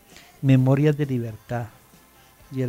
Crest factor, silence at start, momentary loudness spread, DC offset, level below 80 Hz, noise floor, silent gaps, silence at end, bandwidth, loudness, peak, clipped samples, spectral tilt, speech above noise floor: 18 dB; 0.4 s; 15 LU; under 0.1%; -56 dBFS; -53 dBFS; none; 0 s; 15.5 kHz; -22 LUFS; -6 dBFS; under 0.1%; -8.5 dB/octave; 32 dB